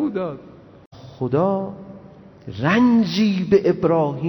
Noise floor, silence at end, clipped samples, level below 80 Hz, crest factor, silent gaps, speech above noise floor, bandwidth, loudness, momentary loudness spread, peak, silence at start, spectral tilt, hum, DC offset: -44 dBFS; 0 s; under 0.1%; -56 dBFS; 16 dB; 0.86-0.91 s; 25 dB; 17.5 kHz; -19 LUFS; 22 LU; -4 dBFS; 0 s; -7.5 dB/octave; none; under 0.1%